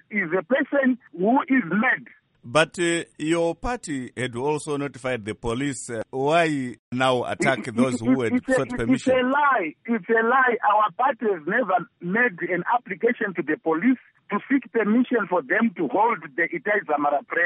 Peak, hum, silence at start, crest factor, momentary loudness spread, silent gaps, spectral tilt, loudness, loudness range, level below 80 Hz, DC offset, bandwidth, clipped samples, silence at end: -6 dBFS; none; 0.1 s; 18 dB; 8 LU; 6.79-6.91 s; -5 dB/octave; -23 LUFS; 5 LU; -52 dBFS; under 0.1%; 11.5 kHz; under 0.1%; 0 s